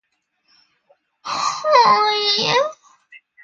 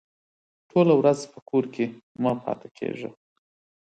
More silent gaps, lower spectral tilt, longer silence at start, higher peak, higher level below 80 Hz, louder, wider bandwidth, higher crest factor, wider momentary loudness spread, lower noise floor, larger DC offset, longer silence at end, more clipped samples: second, none vs 1.42-1.46 s, 2.03-2.15 s, 2.71-2.75 s; second, -1.5 dB/octave vs -7 dB/octave; first, 1.25 s vs 0.75 s; first, 0 dBFS vs -8 dBFS; about the same, -68 dBFS vs -70 dBFS; first, -16 LUFS vs -25 LUFS; about the same, 8.8 kHz vs 9.2 kHz; about the same, 20 dB vs 20 dB; about the same, 14 LU vs 14 LU; second, -66 dBFS vs under -90 dBFS; neither; second, 0.25 s vs 0.75 s; neither